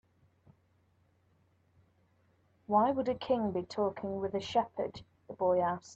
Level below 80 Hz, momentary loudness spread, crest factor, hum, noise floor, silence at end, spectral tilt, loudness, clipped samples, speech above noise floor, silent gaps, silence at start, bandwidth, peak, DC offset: -70 dBFS; 10 LU; 20 dB; none; -71 dBFS; 0 s; -6.5 dB/octave; -33 LUFS; under 0.1%; 39 dB; none; 2.7 s; 8 kHz; -14 dBFS; under 0.1%